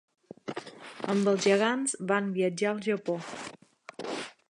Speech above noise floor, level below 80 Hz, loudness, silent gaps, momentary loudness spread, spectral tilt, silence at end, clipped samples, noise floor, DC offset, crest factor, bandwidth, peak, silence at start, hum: 24 dB; -78 dBFS; -29 LUFS; none; 19 LU; -4.5 dB/octave; 0.2 s; under 0.1%; -51 dBFS; under 0.1%; 20 dB; 11 kHz; -10 dBFS; 0.45 s; none